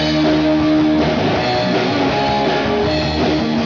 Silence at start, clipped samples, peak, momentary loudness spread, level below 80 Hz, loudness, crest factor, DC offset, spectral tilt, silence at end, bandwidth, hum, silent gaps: 0 s; under 0.1%; -8 dBFS; 2 LU; -36 dBFS; -16 LUFS; 8 dB; 0.2%; -6 dB/octave; 0 s; 7.2 kHz; none; none